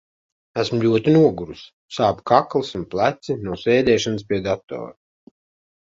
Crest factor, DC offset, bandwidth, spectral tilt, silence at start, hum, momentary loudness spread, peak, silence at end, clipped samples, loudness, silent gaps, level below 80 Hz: 20 dB; under 0.1%; 7.8 kHz; -6 dB/octave; 0.55 s; none; 17 LU; 0 dBFS; 1 s; under 0.1%; -20 LUFS; 1.73-1.89 s; -52 dBFS